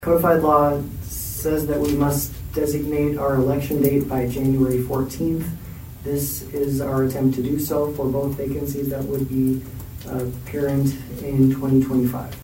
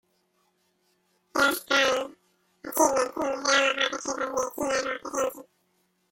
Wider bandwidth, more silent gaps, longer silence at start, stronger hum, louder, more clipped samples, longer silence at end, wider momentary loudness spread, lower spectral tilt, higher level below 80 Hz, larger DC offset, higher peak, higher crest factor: about the same, 16.5 kHz vs 16.5 kHz; neither; second, 0 s vs 1.35 s; neither; first, -22 LUFS vs -26 LUFS; neither; second, 0 s vs 0.7 s; about the same, 10 LU vs 10 LU; first, -7 dB/octave vs -1 dB/octave; first, -38 dBFS vs -64 dBFS; neither; about the same, -4 dBFS vs -6 dBFS; about the same, 18 dB vs 22 dB